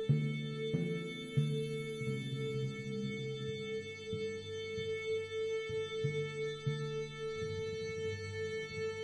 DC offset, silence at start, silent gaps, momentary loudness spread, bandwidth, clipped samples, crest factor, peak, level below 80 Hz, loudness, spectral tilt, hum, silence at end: under 0.1%; 0 s; none; 4 LU; 11.5 kHz; under 0.1%; 18 dB; -20 dBFS; -68 dBFS; -39 LUFS; -6 dB/octave; none; 0 s